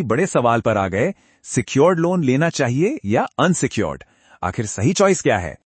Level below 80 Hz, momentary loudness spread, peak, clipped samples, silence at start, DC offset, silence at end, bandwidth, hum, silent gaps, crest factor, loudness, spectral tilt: -50 dBFS; 9 LU; -2 dBFS; under 0.1%; 0 s; under 0.1%; 0.15 s; 8.8 kHz; none; none; 16 dB; -19 LUFS; -5.5 dB/octave